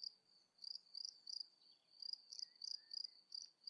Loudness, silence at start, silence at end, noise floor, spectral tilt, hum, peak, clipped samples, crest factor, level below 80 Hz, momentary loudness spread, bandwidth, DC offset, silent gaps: -51 LUFS; 0 s; 0 s; -74 dBFS; 3 dB/octave; none; -34 dBFS; under 0.1%; 20 dB; under -90 dBFS; 7 LU; 12 kHz; under 0.1%; none